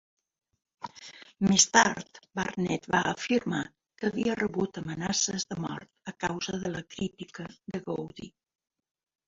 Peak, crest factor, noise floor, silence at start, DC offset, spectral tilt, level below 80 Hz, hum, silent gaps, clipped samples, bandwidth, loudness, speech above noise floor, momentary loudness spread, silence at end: -4 dBFS; 26 dB; -50 dBFS; 0.8 s; under 0.1%; -3 dB/octave; -62 dBFS; none; none; under 0.1%; 8 kHz; -29 LUFS; 21 dB; 20 LU; 1 s